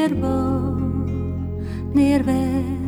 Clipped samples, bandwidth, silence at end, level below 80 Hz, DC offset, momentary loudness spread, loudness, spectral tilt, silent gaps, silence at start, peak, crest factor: under 0.1%; 14 kHz; 0 s; -34 dBFS; under 0.1%; 9 LU; -21 LUFS; -8 dB/octave; none; 0 s; -6 dBFS; 14 dB